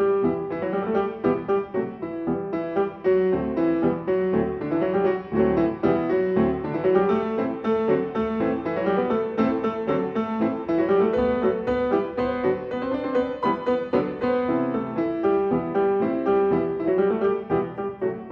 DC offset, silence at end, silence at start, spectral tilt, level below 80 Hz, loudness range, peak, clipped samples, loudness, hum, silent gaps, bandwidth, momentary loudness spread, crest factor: under 0.1%; 0 s; 0 s; -9.5 dB/octave; -50 dBFS; 2 LU; -6 dBFS; under 0.1%; -24 LUFS; none; none; 5.8 kHz; 5 LU; 16 dB